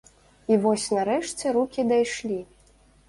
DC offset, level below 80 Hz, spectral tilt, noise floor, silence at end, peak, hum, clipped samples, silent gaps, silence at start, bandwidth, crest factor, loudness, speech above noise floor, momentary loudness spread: under 0.1%; -60 dBFS; -4.5 dB/octave; -57 dBFS; 0.65 s; -8 dBFS; none; under 0.1%; none; 0.5 s; 11.5 kHz; 16 dB; -25 LUFS; 33 dB; 10 LU